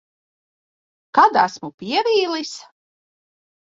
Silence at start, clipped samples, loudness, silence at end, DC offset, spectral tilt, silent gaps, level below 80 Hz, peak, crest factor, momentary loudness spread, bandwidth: 1.15 s; under 0.1%; -18 LUFS; 1.1 s; under 0.1%; -3.5 dB/octave; 1.74-1.78 s; -68 dBFS; 0 dBFS; 22 dB; 17 LU; 7.8 kHz